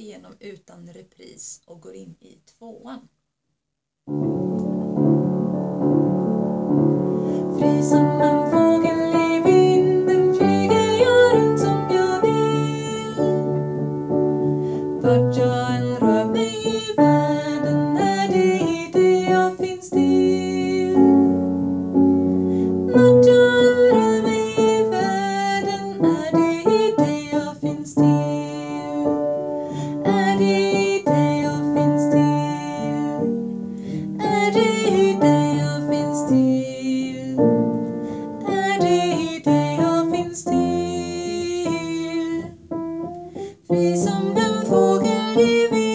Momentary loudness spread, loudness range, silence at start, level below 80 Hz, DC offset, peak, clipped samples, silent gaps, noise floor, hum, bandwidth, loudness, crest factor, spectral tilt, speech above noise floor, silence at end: 11 LU; 7 LU; 0 s; -52 dBFS; under 0.1%; -4 dBFS; under 0.1%; none; -80 dBFS; none; 8 kHz; -19 LUFS; 16 dB; -6.5 dB/octave; 56 dB; 0 s